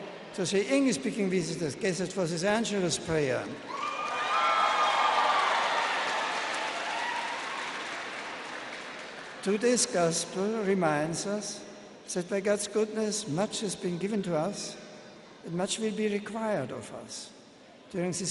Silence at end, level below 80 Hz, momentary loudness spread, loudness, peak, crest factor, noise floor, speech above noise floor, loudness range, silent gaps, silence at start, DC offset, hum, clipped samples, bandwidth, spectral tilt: 0 s; -66 dBFS; 15 LU; -30 LUFS; -12 dBFS; 18 dB; -53 dBFS; 23 dB; 7 LU; none; 0 s; under 0.1%; none; under 0.1%; 11.5 kHz; -3.5 dB/octave